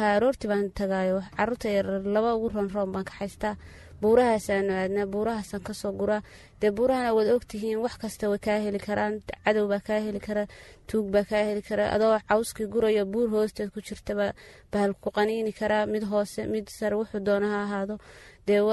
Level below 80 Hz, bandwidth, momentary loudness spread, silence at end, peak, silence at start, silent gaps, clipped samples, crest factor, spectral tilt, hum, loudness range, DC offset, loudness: -52 dBFS; 12 kHz; 9 LU; 0 s; -8 dBFS; 0 s; none; under 0.1%; 18 dB; -6 dB/octave; none; 2 LU; under 0.1%; -27 LUFS